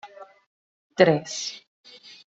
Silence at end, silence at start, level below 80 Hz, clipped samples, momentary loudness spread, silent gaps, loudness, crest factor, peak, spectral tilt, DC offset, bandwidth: 0.7 s; 0.05 s; -70 dBFS; under 0.1%; 25 LU; 0.46-0.90 s; -23 LUFS; 26 dB; -2 dBFS; -4.5 dB/octave; under 0.1%; 8 kHz